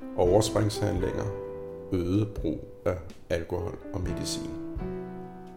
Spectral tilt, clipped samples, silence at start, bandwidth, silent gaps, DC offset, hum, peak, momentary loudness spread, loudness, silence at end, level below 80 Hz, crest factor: -6 dB/octave; under 0.1%; 0 s; 16.5 kHz; none; under 0.1%; none; -8 dBFS; 14 LU; -30 LUFS; 0 s; -44 dBFS; 22 dB